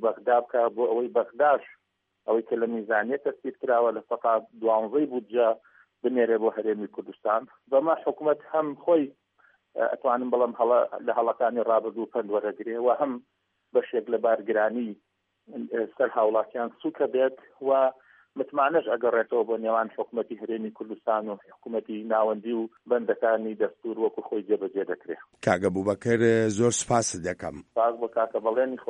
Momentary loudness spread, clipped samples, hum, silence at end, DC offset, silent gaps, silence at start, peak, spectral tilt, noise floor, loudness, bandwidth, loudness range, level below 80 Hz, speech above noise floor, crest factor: 10 LU; under 0.1%; none; 0.05 s; under 0.1%; none; 0 s; -6 dBFS; -5 dB/octave; -64 dBFS; -27 LUFS; 10.5 kHz; 3 LU; -70 dBFS; 38 dB; 20 dB